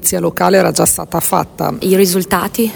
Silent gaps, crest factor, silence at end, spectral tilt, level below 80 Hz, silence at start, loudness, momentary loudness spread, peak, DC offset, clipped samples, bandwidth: none; 14 dB; 0 s; -4 dB/octave; -42 dBFS; 0 s; -13 LUFS; 5 LU; 0 dBFS; under 0.1%; under 0.1%; over 20 kHz